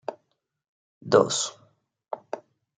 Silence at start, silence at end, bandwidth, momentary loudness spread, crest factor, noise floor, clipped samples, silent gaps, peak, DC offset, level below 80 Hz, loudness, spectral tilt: 0.1 s; 0.4 s; 9.6 kHz; 19 LU; 24 dB; -76 dBFS; under 0.1%; 0.68-1.01 s; -4 dBFS; under 0.1%; -76 dBFS; -24 LUFS; -3.5 dB/octave